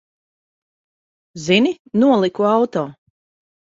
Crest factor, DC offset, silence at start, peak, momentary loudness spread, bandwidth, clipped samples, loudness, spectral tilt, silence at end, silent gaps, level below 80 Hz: 18 dB; under 0.1%; 1.35 s; -2 dBFS; 12 LU; 7.8 kHz; under 0.1%; -17 LUFS; -5.5 dB/octave; 0.7 s; 1.79-1.85 s; -62 dBFS